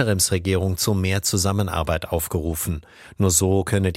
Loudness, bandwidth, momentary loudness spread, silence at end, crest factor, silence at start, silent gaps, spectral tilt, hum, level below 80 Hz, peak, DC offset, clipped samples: -21 LUFS; 16.5 kHz; 7 LU; 0 s; 16 dB; 0 s; none; -4.5 dB/octave; none; -38 dBFS; -4 dBFS; under 0.1%; under 0.1%